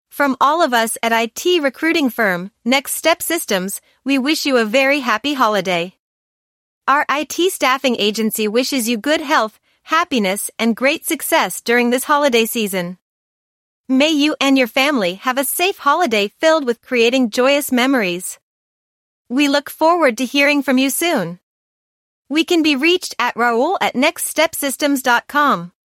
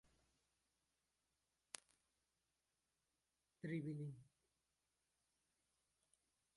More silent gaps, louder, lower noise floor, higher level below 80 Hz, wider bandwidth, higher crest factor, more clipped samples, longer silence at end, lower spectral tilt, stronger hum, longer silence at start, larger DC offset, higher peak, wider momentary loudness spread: first, 5.99-6.81 s, 13.01-13.84 s, 18.42-19.25 s, 21.43-22.25 s vs none; first, -16 LUFS vs -52 LUFS; about the same, under -90 dBFS vs under -90 dBFS; first, -66 dBFS vs -90 dBFS; first, 16.5 kHz vs 11 kHz; second, 16 dB vs 34 dB; neither; second, 0.2 s vs 2.3 s; second, -3 dB/octave vs -6 dB/octave; neither; second, 0.15 s vs 3.65 s; neither; first, -2 dBFS vs -24 dBFS; second, 6 LU vs 11 LU